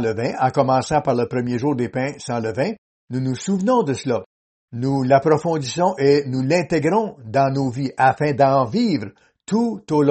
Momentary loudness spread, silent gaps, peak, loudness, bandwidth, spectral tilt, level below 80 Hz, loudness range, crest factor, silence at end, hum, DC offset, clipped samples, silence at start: 9 LU; 2.78-3.07 s, 4.26-4.68 s; -2 dBFS; -20 LUFS; 8.8 kHz; -6.5 dB/octave; -56 dBFS; 4 LU; 18 dB; 0 s; none; under 0.1%; under 0.1%; 0 s